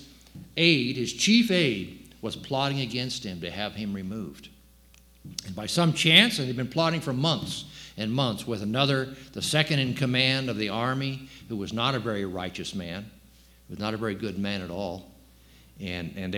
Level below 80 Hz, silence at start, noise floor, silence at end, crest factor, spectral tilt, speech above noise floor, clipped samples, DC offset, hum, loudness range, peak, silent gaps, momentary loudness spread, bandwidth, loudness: -56 dBFS; 0 s; -56 dBFS; 0 s; 26 dB; -4.5 dB/octave; 29 dB; under 0.1%; under 0.1%; none; 9 LU; -2 dBFS; none; 16 LU; 18.5 kHz; -26 LUFS